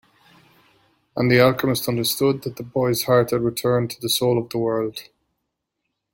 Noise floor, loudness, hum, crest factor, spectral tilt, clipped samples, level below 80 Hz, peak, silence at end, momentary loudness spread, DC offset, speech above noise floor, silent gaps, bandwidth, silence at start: -78 dBFS; -21 LUFS; none; 20 dB; -5 dB/octave; under 0.1%; -56 dBFS; -2 dBFS; 1.1 s; 11 LU; under 0.1%; 58 dB; none; 17 kHz; 1.15 s